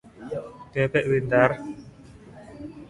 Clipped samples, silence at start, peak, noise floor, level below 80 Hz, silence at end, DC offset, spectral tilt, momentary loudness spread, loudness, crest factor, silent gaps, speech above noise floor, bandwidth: under 0.1%; 0.05 s; -2 dBFS; -47 dBFS; -54 dBFS; 0 s; under 0.1%; -7.5 dB/octave; 21 LU; -24 LUFS; 24 dB; none; 25 dB; 11.5 kHz